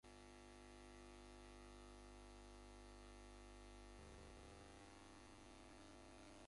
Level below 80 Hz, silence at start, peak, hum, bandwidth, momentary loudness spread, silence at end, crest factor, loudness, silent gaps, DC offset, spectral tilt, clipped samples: -66 dBFS; 0.05 s; -52 dBFS; 50 Hz at -65 dBFS; 11.5 kHz; 1 LU; 0 s; 10 dB; -62 LUFS; none; under 0.1%; -4.5 dB/octave; under 0.1%